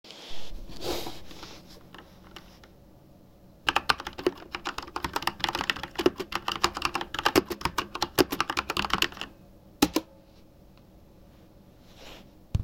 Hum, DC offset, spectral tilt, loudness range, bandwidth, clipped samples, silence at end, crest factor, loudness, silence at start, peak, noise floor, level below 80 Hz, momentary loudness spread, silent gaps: none; under 0.1%; -3.5 dB/octave; 8 LU; 17 kHz; under 0.1%; 0 s; 28 dB; -29 LUFS; 0.05 s; -4 dBFS; -54 dBFS; -48 dBFS; 23 LU; none